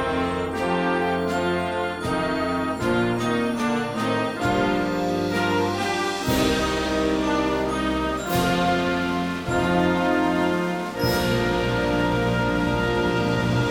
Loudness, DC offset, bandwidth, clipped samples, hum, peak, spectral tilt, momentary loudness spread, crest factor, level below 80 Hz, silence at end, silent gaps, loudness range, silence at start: -23 LUFS; under 0.1%; 17 kHz; under 0.1%; none; -8 dBFS; -5.5 dB/octave; 4 LU; 16 dB; -40 dBFS; 0 s; none; 2 LU; 0 s